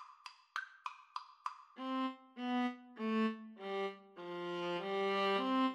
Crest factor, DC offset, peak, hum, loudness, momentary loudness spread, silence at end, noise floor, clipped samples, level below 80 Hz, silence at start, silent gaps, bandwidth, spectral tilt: 16 dB; under 0.1%; -24 dBFS; none; -40 LUFS; 15 LU; 0 s; -58 dBFS; under 0.1%; under -90 dBFS; 0 s; none; 11.5 kHz; -5.5 dB/octave